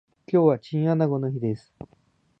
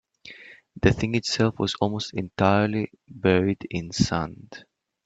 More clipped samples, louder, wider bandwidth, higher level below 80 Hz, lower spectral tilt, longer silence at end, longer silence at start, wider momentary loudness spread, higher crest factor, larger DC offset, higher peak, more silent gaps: neither; about the same, -24 LUFS vs -24 LUFS; second, 6 kHz vs 8.8 kHz; second, -64 dBFS vs -48 dBFS; first, -10.5 dB/octave vs -5.5 dB/octave; first, 0.85 s vs 0.45 s; about the same, 0.3 s vs 0.25 s; second, 9 LU vs 22 LU; about the same, 18 dB vs 20 dB; neither; about the same, -6 dBFS vs -4 dBFS; neither